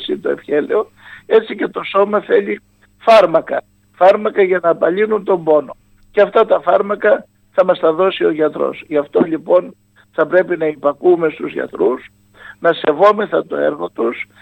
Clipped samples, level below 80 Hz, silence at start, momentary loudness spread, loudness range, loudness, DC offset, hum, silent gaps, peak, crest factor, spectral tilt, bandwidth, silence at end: under 0.1%; -60 dBFS; 0 s; 9 LU; 3 LU; -15 LUFS; under 0.1%; none; none; 0 dBFS; 16 dB; -6.5 dB/octave; 9.2 kHz; 0.2 s